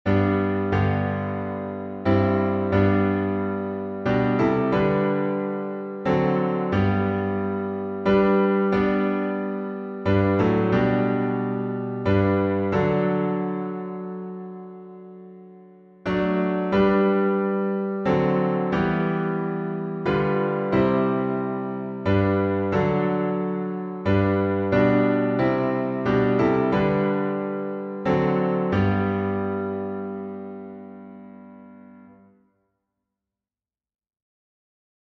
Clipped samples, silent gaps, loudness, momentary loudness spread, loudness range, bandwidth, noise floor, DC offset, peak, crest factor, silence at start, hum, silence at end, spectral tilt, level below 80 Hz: under 0.1%; none; -23 LUFS; 11 LU; 6 LU; 6.2 kHz; under -90 dBFS; under 0.1%; -6 dBFS; 16 dB; 0.05 s; none; 3 s; -9.5 dB/octave; -50 dBFS